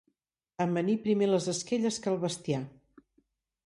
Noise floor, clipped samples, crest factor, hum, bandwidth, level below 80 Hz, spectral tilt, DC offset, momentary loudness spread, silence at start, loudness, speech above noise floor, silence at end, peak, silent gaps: -79 dBFS; under 0.1%; 16 dB; none; 11.5 kHz; -72 dBFS; -5.5 dB/octave; under 0.1%; 8 LU; 0.6 s; -30 LUFS; 50 dB; 1 s; -16 dBFS; none